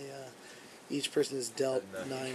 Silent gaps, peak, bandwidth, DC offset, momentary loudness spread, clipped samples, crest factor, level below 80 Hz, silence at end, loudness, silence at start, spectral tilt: none; -18 dBFS; 13.5 kHz; under 0.1%; 18 LU; under 0.1%; 18 dB; -82 dBFS; 0 s; -35 LUFS; 0 s; -3.5 dB/octave